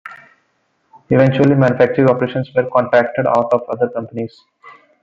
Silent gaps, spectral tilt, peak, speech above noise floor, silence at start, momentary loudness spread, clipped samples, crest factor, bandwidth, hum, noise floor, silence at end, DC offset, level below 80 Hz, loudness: none; -9 dB/octave; 0 dBFS; 49 dB; 0.05 s; 13 LU; under 0.1%; 16 dB; 7.4 kHz; none; -64 dBFS; 0.3 s; under 0.1%; -54 dBFS; -15 LUFS